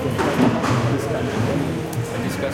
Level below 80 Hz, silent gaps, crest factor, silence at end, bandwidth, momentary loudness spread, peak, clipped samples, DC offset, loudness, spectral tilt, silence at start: -46 dBFS; none; 18 dB; 0 s; 16.5 kHz; 7 LU; -4 dBFS; under 0.1%; under 0.1%; -21 LUFS; -6.5 dB/octave; 0 s